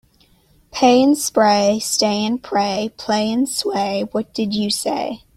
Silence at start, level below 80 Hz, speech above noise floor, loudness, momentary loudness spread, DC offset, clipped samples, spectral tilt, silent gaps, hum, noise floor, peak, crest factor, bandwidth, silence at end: 0.75 s; -56 dBFS; 37 dB; -18 LUFS; 8 LU; under 0.1%; under 0.1%; -3.5 dB/octave; none; none; -55 dBFS; -2 dBFS; 16 dB; 16 kHz; 0.2 s